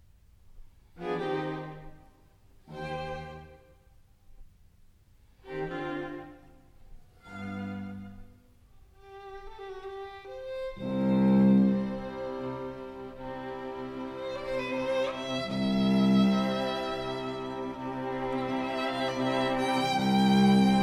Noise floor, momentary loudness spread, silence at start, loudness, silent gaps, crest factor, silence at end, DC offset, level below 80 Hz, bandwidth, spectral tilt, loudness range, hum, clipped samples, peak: -59 dBFS; 20 LU; 0.5 s; -29 LUFS; none; 18 dB; 0 s; under 0.1%; -54 dBFS; 11.5 kHz; -6.5 dB/octave; 15 LU; none; under 0.1%; -12 dBFS